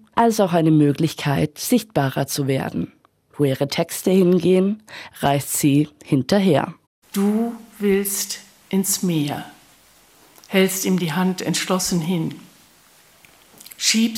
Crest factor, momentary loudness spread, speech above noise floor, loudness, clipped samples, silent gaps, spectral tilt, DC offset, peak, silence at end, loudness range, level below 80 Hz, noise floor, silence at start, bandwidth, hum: 18 dB; 11 LU; 33 dB; -20 LUFS; under 0.1%; 6.87-7.02 s; -5 dB/octave; under 0.1%; -2 dBFS; 0 s; 4 LU; -58 dBFS; -53 dBFS; 0.15 s; 17 kHz; none